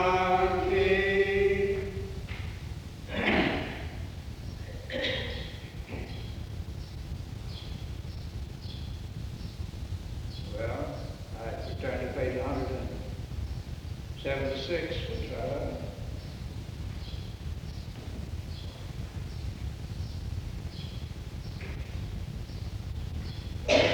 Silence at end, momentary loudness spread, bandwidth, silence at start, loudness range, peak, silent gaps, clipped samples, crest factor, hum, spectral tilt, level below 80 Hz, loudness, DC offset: 0 s; 14 LU; over 20 kHz; 0 s; 10 LU; -10 dBFS; none; under 0.1%; 22 dB; none; -6 dB/octave; -42 dBFS; -34 LUFS; under 0.1%